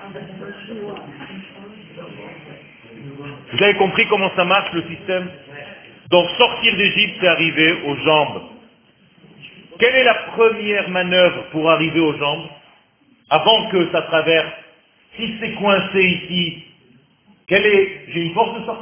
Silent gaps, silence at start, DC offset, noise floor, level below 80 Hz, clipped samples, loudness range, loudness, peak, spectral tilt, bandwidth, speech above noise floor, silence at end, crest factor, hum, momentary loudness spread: none; 0 s; under 0.1%; -56 dBFS; -56 dBFS; under 0.1%; 4 LU; -16 LUFS; 0 dBFS; -8.5 dB/octave; 3.6 kHz; 38 dB; 0 s; 18 dB; none; 22 LU